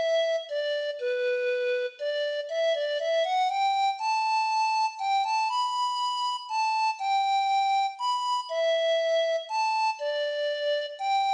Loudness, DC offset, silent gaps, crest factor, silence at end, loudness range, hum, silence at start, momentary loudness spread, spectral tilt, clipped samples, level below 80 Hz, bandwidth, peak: -27 LUFS; under 0.1%; none; 10 dB; 0 s; 1 LU; none; 0 s; 5 LU; 3 dB/octave; under 0.1%; -84 dBFS; 10 kHz; -18 dBFS